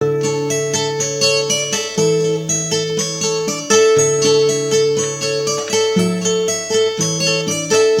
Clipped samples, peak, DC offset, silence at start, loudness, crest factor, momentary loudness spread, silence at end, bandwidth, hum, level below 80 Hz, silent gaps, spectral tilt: under 0.1%; 0 dBFS; under 0.1%; 0 s; -16 LUFS; 16 dB; 5 LU; 0 s; 16.5 kHz; none; -58 dBFS; none; -3 dB/octave